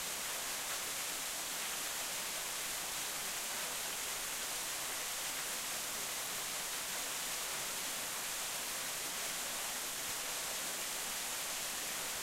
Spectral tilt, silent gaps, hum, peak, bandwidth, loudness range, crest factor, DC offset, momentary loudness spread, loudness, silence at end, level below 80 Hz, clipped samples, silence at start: 0.5 dB/octave; none; none; -26 dBFS; 16 kHz; 0 LU; 14 dB; under 0.1%; 0 LU; -37 LUFS; 0 s; -68 dBFS; under 0.1%; 0 s